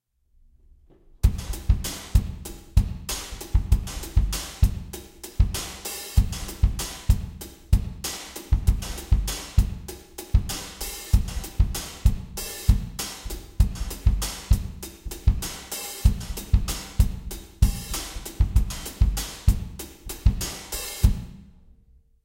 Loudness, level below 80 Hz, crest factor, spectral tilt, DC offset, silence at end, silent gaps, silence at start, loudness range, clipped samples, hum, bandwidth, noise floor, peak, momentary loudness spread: -27 LUFS; -26 dBFS; 20 dB; -4.5 dB/octave; under 0.1%; 0.8 s; none; 1.25 s; 1 LU; under 0.1%; none; 17 kHz; -59 dBFS; -4 dBFS; 11 LU